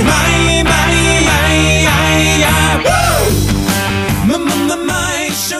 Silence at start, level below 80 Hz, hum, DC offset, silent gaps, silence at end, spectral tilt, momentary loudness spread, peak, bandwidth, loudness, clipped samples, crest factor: 0 s; -22 dBFS; none; under 0.1%; none; 0 s; -4 dB/octave; 5 LU; 0 dBFS; 16 kHz; -11 LUFS; under 0.1%; 12 dB